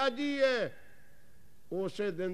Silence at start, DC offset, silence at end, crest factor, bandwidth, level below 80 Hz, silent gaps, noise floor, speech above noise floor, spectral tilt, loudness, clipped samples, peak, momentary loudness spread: 0 s; 0.5%; 0 s; 16 dB; 14 kHz; -70 dBFS; none; -64 dBFS; 32 dB; -5 dB/octave; -33 LUFS; under 0.1%; -16 dBFS; 10 LU